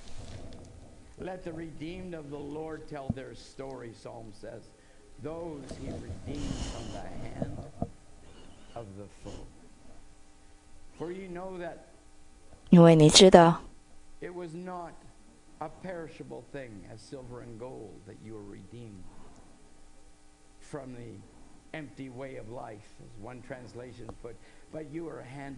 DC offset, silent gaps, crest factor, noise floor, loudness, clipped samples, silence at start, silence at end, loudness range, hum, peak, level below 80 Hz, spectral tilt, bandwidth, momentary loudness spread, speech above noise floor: under 0.1%; none; 30 dB; -55 dBFS; -25 LUFS; under 0.1%; 0 s; 0 s; 25 LU; none; 0 dBFS; -52 dBFS; -5 dB/octave; 11 kHz; 24 LU; 25 dB